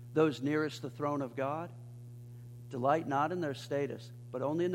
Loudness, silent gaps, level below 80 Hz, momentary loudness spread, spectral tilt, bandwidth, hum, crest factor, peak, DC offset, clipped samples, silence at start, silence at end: -35 LUFS; none; -74 dBFS; 19 LU; -7 dB/octave; 16 kHz; 60 Hz at -50 dBFS; 20 dB; -16 dBFS; under 0.1%; under 0.1%; 0 s; 0 s